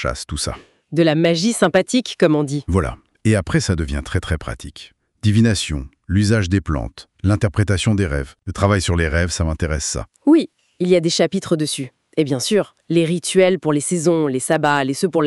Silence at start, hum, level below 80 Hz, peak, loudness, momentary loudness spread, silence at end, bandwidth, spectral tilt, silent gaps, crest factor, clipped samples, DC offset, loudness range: 0 s; none; -34 dBFS; -2 dBFS; -19 LUFS; 10 LU; 0 s; 12 kHz; -5.5 dB/octave; none; 16 dB; under 0.1%; under 0.1%; 2 LU